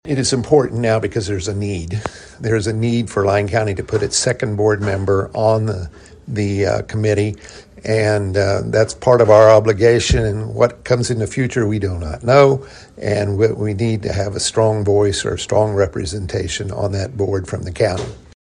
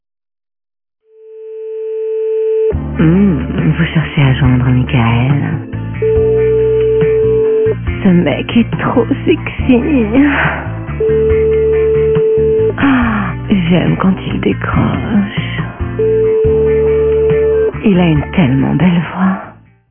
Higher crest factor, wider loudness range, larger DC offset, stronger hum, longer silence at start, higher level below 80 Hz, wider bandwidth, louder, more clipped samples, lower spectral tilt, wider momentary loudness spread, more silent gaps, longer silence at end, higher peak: about the same, 16 dB vs 12 dB; first, 5 LU vs 2 LU; neither; neither; second, 0.05 s vs 1.25 s; second, -36 dBFS vs -28 dBFS; first, 10.5 kHz vs 3.5 kHz; second, -17 LUFS vs -12 LUFS; neither; second, -5.5 dB/octave vs -12 dB/octave; first, 10 LU vs 7 LU; neither; second, 0.25 s vs 0.4 s; about the same, 0 dBFS vs 0 dBFS